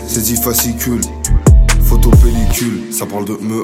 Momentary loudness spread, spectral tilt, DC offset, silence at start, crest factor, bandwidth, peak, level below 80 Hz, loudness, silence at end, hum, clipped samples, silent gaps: 9 LU; -5 dB/octave; under 0.1%; 0 s; 10 dB; 16.5 kHz; 0 dBFS; -14 dBFS; -13 LUFS; 0 s; none; under 0.1%; none